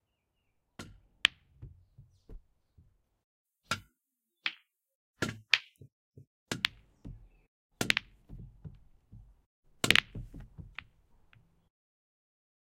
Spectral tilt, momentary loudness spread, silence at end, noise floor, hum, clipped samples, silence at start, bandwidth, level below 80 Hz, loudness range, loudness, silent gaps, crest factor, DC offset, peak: -2 dB/octave; 28 LU; 2 s; -85 dBFS; none; under 0.1%; 0.8 s; 16 kHz; -58 dBFS; 10 LU; -31 LUFS; 3.24-3.45 s, 4.95-5.14 s, 5.92-6.11 s, 6.27-6.46 s, 7.48-7.70 s, 9.46-9.63 s; 38 dB; under 0.1%; -2 dBFS